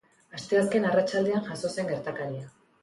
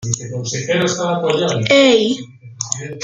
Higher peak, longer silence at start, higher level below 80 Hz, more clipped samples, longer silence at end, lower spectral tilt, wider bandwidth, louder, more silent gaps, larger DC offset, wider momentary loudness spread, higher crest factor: second, -14 dBFS vs 0 dBFS; first, 0.35 s vs 0 s; second, -68 dBFS vs -54 dBFS; neither; first, 0.35 s vs 0 s; first, -5.5 dB/octave vs -4 dB/octave; first, 11.5 kHz vs 9.6 kHz; second, -28 LUFS vs -16 LUFS; neither; neither; first, 17 LU vs 12 LU; about the same, 16 dB vs 16 dB